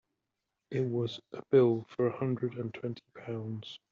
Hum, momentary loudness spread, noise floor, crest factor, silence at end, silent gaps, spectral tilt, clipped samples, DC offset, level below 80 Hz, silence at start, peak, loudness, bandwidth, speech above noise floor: none; 15 LU; -86 dBFS; 20 dB; 0.15 s; none; -7 dB/octave; under 0.1%; under 0.1%; -74 dBFS; 0.7 s; -12 dBFS; -32 LUFS; 7 kHz; 54 dB